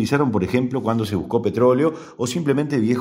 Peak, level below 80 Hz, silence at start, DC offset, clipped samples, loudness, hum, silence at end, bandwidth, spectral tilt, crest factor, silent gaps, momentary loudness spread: -4 dBFS; -52 dBFS; 0 s; under 0.1%; under 0.1%; -20 LUFS; none; 0 s; 16 kHz; -6.5 dB/octave; 16 dB; none; 6 LU